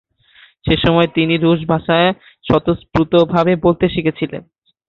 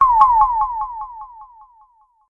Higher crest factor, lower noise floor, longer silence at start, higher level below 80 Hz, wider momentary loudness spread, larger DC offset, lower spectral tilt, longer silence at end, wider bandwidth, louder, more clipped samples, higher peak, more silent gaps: about the same, 14 dB vs 18 dB; second, -49 dBFS vs -55 dBFS; first, 0.65 s vs 0 s; about the same, -38 dBFS vs -42 dBFS; second, 11 LU vs 24 LU; neither; first, -8.5 dB/octave vs -4.5 dB/octave; second, 0.45 s vs 0.85 s; about the same, 6 kHz vs 5.8 kHz; about the same, -15 LUFS vs -16 LUFS; neither; about the same, -2 dBFS vs 0 dBFS; neither